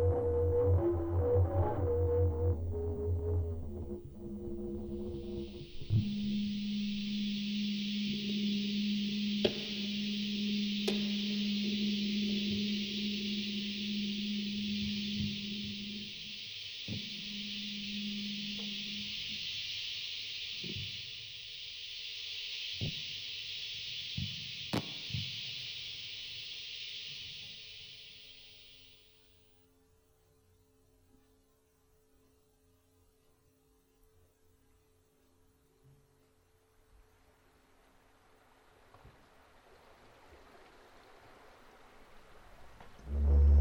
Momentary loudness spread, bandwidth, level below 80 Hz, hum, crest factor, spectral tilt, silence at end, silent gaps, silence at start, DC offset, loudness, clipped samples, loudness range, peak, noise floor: 12 LU; over 20 kHz; -44 dBFS; none; 24 dB; -6 dB/octave; 0 s; none; 0 s; under 0.1%; -36 LUFS; under 0.1%; 9 LU; -14 dBFS; -70 dBFS